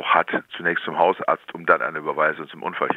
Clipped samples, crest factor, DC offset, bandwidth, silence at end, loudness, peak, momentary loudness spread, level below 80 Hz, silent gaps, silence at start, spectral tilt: under 0.1%; 22 dB; under 0.1%; 4.9 kHz; 0 s; -22 LUFS; -2 dBFS; 7 LU; -76 dBFS; none; 0 s; -6.5 dB/octave